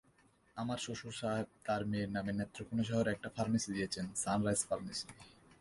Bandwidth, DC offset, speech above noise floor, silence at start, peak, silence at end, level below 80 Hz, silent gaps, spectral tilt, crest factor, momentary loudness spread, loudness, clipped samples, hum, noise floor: 11.5 kHz; under 0.1%; 32 dB; 0.55 s; -20 dBFS; 0.3 s; -64 dBFS; none; -4.5 dB/octave; 20 dB; 8 LU; -38 LUFS; under 0.1%; none; -70 dBFS